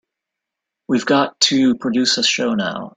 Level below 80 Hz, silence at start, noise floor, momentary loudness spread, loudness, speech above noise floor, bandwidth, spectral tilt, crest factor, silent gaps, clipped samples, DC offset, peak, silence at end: -60 dBFS; 0.9 s; -83 dBFS; 7 LU; -16 LUFS; 65 dB; 9.6 kHz; -3 dB/octave; 18 dB; none; under 0.1%; under 0.1%; 0 dBFS; 0.1 s